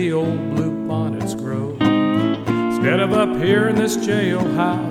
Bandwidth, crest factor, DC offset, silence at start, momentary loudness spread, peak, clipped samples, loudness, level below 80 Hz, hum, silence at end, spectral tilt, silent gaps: 16 kHz; 14 dB; under 0.1%; 0 s; 6 LU; -4 dBFS; under 0.1%; -19 LUFS; -50 dBFS; none; 0 s; -6 dB/octave; none